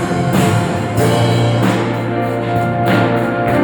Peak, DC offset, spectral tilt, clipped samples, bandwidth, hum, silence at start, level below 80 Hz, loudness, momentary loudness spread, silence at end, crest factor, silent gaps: -2 dBFS; under 0.1%; -6.5 dB/octave; under 0.1%; 19.5 kHz; none; 0 s; -40 dBFS; -15 LUFS; 4 LU; 0 s; 12 dB; none